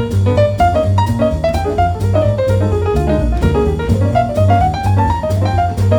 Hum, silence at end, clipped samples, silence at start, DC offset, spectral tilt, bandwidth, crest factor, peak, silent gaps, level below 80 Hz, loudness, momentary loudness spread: none; 0 s; under 0.1%; 0 s; under 0.1%; -8 dB/octave; 11.5 kHz; 12 dB; 0 dBFS; none; -24 dBFS; -14 LUFS; 3 LU